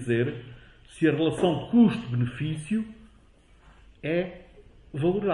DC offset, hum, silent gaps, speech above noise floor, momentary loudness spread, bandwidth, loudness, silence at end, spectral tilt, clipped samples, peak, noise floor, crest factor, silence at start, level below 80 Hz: under 0.1%; none; none; 31 dB; 17 LU; 11.5 kHz; -26 LUFS; 0 s; -7.5 dB/octave; under 0.1%; -10 dBFS; -56 dBFS; 18 dB; 0 s; -54 dBFS